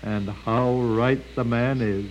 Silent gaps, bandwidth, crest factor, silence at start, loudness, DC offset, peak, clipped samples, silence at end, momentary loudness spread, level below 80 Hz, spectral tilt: none; 9 kHz; 14 dB; 0 s; -24 LUFS; under 0.1%; -8 dBFS; under 0.1%; 0 s; 5 LU; -44 dBFS; -8.5 dB/octave